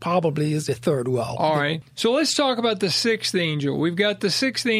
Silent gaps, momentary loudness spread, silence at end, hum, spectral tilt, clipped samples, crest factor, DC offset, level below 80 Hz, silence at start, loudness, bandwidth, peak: none; 4 LU; 0 s; none; -4.5 dB/octave; under 0.1%; 16 dB; under 0.1%; -62 dBFS; 0 s; -22 LUFS; 15 kHz; -6 dBFS